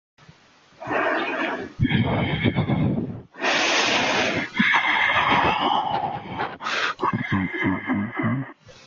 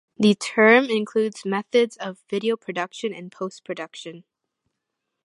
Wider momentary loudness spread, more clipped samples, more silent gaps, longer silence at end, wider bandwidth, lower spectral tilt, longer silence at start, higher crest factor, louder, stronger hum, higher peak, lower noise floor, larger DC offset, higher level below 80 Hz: second, 10 LU vs 18 LU; neither; neither; second, 0.15 s vs 1.05 s; second, 7.6 kHz vs 11.5 kHz; about the same, -4.5 dB/octave vs -5 dB/octave; first, 0.8 s vs 0.2 s; about the same, 18 dB vs 20 dB; about the same, -22 LUFS vs -22 LUFS; neither; second, -6 dBFS vs -2 dBFS; second, -54 dBFS vs -81 dBFS; neither; first, -48 dBFS vs -74 dBFS